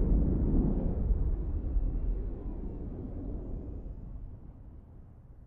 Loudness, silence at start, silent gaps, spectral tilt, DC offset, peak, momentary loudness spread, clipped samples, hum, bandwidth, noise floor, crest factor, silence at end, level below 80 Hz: -35 LUFS; 0 s; none; -13.5 dB/octave; under 0.1%; -16 dBFS; 22 LU; under 0.1%; none; 1.9 kHz; -51 dBFS; 16 dB; 0 s; -32 dBFS